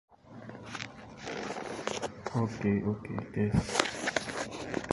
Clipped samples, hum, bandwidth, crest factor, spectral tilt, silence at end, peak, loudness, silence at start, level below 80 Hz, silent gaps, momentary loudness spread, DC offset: under 0.1%; none; 11.5 kHz; 30 dB; -5 dB/octave; 0 s; -4 dBFS; -34 LUFS; 0.1 s; -52 dBFS; none; 14 LU; under 0.1%